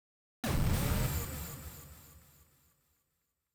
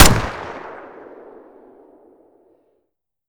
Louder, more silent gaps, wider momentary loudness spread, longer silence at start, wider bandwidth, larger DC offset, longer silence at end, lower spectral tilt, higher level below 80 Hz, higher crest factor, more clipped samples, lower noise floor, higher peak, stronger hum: second, -35 LUFS vs -19 LUFS; neither; second, 21 LU vs 24 LU; first, 0.45 s vs 0 s; about the same, over 20 kHz vs over 20 kHz; neither; second, 1.35 s vs 2.6 s; first, -5 dB/octave vs -3.5 dB/octave; second, -44 dBFS vs -30 dBFS; about the same, 18 dB vs 20 dB; neither; first, -83 dBFS vs -74 dBFS; second, -20 dBFS vs 0 dBFS; neither